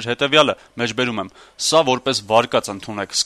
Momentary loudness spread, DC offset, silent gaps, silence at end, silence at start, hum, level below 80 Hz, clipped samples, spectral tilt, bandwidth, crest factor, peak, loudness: 13 LU; under 0.1%; none; 0 s; 0 s; none; -58 dBFS; under 0.1%; -3 dB/octave; 13.5 kHz; 18 dB; -2 dBFS; -18 LUFS